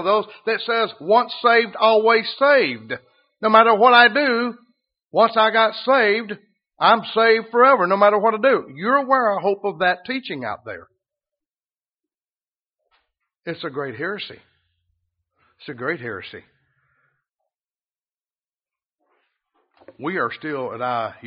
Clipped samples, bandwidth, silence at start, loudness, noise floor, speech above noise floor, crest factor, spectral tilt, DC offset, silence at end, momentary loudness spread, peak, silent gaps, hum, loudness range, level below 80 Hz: under 0.1%; 5.4 kHz; 0 s; -18 LUFS; under -90 dBFS; over 72 dB; 20 dB; -1 dB/octave; under 0.1%; 0 s; 17 LU; 0 dBFS; 11.88-11.98 s, 12.48-12.52 s, 12.59-12.63 s, 18.11-18.15 s; none; 18 LU; -72 dBFS